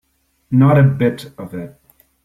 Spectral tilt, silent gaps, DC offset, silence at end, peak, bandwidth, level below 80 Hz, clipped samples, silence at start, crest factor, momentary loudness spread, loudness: -9 dB/octave; none; under 0.1%; 0.55 s; -2 dBFS; 13.5 kHz; -50 dBFS; under 0.1%; 0.5 s; 14 dB; 19 LU; -14 LUFS